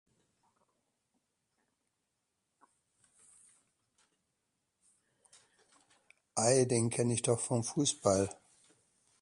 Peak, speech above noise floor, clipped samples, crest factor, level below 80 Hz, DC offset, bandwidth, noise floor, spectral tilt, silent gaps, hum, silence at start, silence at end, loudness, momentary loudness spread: -16 dBFS; 53 dB; under 0.1%; 22 dB; -68 dBFS; under 0.1%; 11.5 kHz; -84 dBFS; -4.5 dB/octave; none; none; 6.35 s; 0.9 s; -31 LUFS; 5 LU